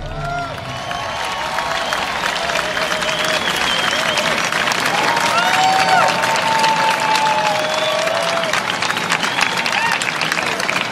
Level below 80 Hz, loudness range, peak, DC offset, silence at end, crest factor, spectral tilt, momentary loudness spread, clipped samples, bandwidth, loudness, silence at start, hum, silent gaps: -44 dBFS; 4 LU; 0 dBFS; under 0.1%; 0 s; 18 dB; -2 dB/octave; 8 LU; under 0.1%; 16 kHz; -16 LUFS; 0 s; none; none